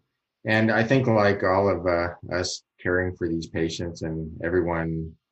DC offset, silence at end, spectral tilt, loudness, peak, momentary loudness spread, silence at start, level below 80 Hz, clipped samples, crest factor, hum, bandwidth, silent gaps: under 0.1%; 0.2 s; -6 dB/octave; -25 LUFS; -6 dBFS; 10 LU; 0.45 s; -48 dBFS; under 0.1%; 18 dB; none; 8.8 kHz; none